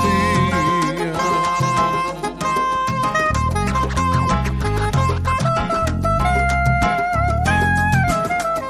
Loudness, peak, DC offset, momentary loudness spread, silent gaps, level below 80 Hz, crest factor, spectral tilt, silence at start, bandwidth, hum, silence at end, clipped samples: -18 LUFS; -6 dBFS; under 0.1%; 4 LU; none; -28 dBFS; 12 dB; -5.5 dB/octave; 0 s; 15.5 kHz; none; 0 s; under 0.1%